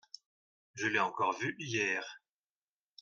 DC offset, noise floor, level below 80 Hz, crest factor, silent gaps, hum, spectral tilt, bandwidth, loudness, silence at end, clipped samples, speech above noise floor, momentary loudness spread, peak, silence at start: under 0.1%; under -90 dBFS; -82 dBFS; 22 dB; none; none; -3.5 dB/octave; 10 kHz; -34 LUFS; 0.85 s; under 0.1%; over 56 dB; 21 LU; -16 dBFS; 0.75 s